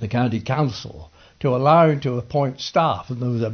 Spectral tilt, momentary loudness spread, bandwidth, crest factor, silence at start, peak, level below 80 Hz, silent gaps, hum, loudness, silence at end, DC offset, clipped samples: -7.5 dB/octave; 11 LU; 6.6 kHz; 16 dB; 0 s; -4 dBFS; -52 dBFS; none; none; -20 LUFS; 0 s; under 0.1%; under 0.1%